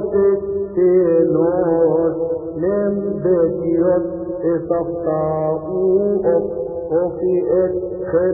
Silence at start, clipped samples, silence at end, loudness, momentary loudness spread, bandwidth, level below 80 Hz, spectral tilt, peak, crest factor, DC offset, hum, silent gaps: 0 s; under 0.1%; 0 s; -18 LUFS; 7 LU; 2.6 kHz; -46 dBFS; -16 dB/octave; -4 dBFS; 12 dB; under 0.1%; none; none